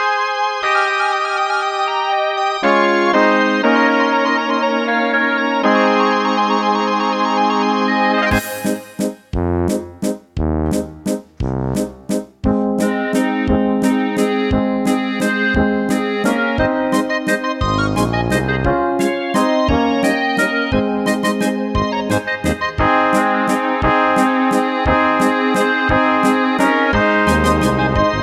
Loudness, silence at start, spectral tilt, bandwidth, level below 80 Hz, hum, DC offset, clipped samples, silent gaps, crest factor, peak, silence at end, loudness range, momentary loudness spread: -16 LUFS; 0 s; -5.5 dB/octave; 16 kHz; -32 dBFS; none; under 0.1%; under 0.1%; none; 16 dB; 0 dBFS; 0 s; 5 LU; 7 LU